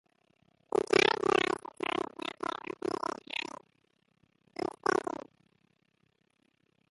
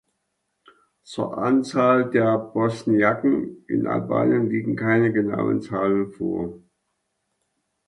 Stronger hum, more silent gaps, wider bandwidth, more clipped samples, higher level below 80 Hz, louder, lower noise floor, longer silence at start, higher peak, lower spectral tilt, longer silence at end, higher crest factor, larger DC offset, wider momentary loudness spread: neither; neither; about the same, 11.5 kHz vs 11 kHz; neither; second, -72 dBFS vs -60 dBFS; second, -32 LUFS vs -22 LUFS; about the same, -74 dBFS vs -76 dBFS; second, 0.75 s vs 1.1 s; second, -10 dBFS vs -6 dBFS; second, -3.5 dB/octave vs -8 dB/octave; first, 1.9 s vs 1.3 s; first, 26 dB vs 18 dB; neither; first, 15 LU vs 8 LU